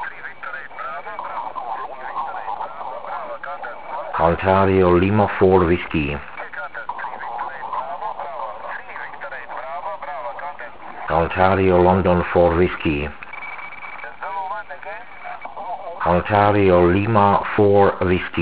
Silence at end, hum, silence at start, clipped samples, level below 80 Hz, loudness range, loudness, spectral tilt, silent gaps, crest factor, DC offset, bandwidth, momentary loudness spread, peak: 0 s; none; 0 s; under 0.1%; -38 dBFS; 11 LU; -20 LUFS; -11 dB/octave; none; 20 dB; 1%; 4 kHz; 17 LU; 0 dBFS